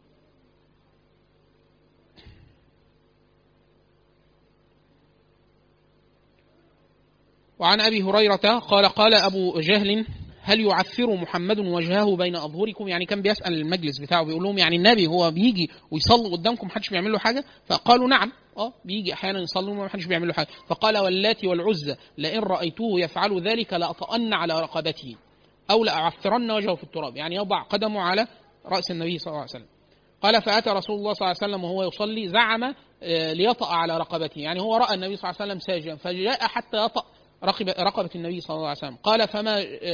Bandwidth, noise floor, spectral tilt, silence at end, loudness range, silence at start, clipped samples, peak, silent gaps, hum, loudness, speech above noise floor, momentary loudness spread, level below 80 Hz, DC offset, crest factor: 5.4 kHz; -62 dBFS; -5 dB/octave; 0 s; 6 LU; 2.25 s; under 0.1%; -2 dBFS; none; none; -23 LUFS; 38 dB; 11 LU; -58 dBFS; under 0.1%; 24 dB